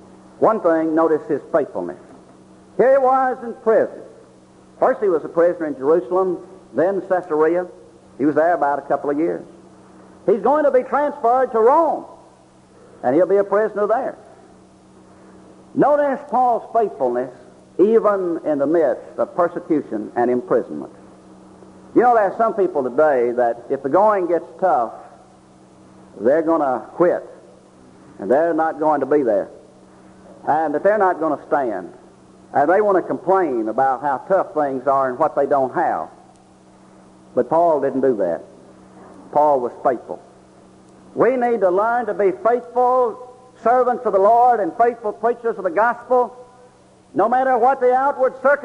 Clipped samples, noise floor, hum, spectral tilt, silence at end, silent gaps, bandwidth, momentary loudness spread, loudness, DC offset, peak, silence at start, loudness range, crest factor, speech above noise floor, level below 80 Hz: under 0.1%; -49 dBFS; none; -8 dB/octave; 0 s; none; 10.5 kHz; 10 LU; -18 LUFS; under 0.1%; -4 dBFS; 0.4 s; 4 LU; 16 dB; 32 dB; -62 dBFS